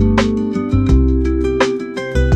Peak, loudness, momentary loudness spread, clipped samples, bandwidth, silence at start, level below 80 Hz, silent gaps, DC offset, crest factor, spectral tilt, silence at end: -2 dBFS; -16 LUFS; 5 LU; under 0.1%; 9 kHz; 0 s; -18 dBFS; none; under 0.1%; 12 dB; -7 dB/octave; 0 s